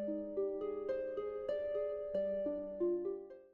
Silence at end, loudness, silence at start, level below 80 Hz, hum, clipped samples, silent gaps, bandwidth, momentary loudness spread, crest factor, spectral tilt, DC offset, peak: 0.05 s; -39 LUFS; 0 s; -68 dBFS; none; under 0.1%; none; 4.5 kHz; 4 LU; 12 dB; -6.5 dB/octave; under 0.1%; -26 dBFS